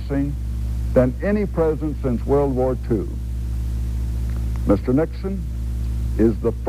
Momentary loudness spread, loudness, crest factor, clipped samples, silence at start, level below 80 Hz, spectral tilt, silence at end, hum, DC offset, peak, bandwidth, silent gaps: 8 LU; -22 LUFS; 18 dB; under 0.1%; 0 s; -26 dBFS; -9 dB/octave; 0 s; none; under 0.1%; -4 dBFS; 13 kHz; none